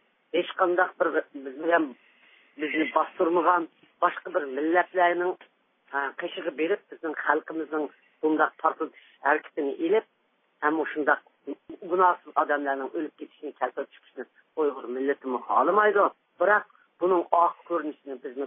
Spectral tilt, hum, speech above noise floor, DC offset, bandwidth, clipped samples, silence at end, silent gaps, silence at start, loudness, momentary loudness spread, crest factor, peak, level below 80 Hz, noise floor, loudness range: -8.5 dB/octave; none; 43 dB; under 0.1%; 3.8 kHz; under 0.1%; 0 s; none; 0.35 s; -26 LUFS; 15 LU; 22 dB; -4 dBFS; under -90 dBFS; -69 dBFS; 4 LU